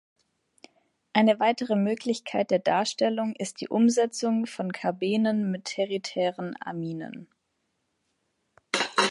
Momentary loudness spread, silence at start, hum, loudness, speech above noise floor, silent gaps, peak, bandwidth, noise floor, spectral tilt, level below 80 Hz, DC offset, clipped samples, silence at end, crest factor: 11 LU; 1.15 s; none; -27 LUFS; 51 dB; none; -6 dBFS; 11.5 kHz; -77 dBFS; -4.5 dB/octave; -76 dBFS; under 0.1%; under 0.1%; 0 s; 22 dB